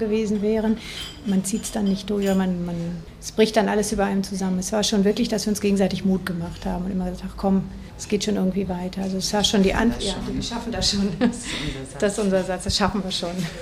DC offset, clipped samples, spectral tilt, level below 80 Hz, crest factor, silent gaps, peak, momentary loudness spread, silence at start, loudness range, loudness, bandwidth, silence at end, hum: under 0.1%; under 0.1%; -5 dB/octave; -40 dBFS; 18 dB; none; -4 dBFS; 9 LU; 0 s; 2 LU; -23 LUFS; 14.5 kHz; 0 s; none